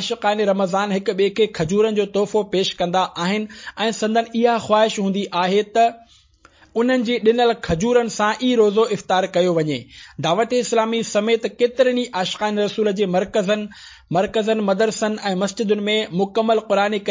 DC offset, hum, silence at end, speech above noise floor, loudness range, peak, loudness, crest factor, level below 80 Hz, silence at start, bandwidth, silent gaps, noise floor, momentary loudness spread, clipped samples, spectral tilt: under 0.1%; none; 0 s; 33 dB; 2 LU; -4 dBFS; -19 LUFS; 16 dB; -52 dBFS; 0 s; 7.6 kHz; none; -52 dBFS; 5 LU; under 0.1%; -5 dB/octave